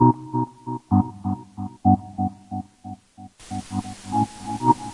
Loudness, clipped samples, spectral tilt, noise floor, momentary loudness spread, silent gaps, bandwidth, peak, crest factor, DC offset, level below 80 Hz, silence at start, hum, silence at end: -25 LUFS; under 0.1%; -8 dB/octave; -46 dBFS; 17 LU; none; 11.5 kHz; -4 dBFS; 20 dB; under 0.1%; -54 dBFS; 0 s; none; 0 s